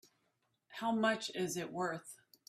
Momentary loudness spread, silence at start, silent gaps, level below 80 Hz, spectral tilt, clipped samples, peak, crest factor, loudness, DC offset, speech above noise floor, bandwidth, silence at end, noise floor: 16 LU; 0.7 s; none; -82 dBFS; -4 dB/octave; under 0.1%; -20 dBFS; 20 dB; -37 LUFS; under 0.1%; 44 dB; 15 kHz; 0.35 s; -81 dBFS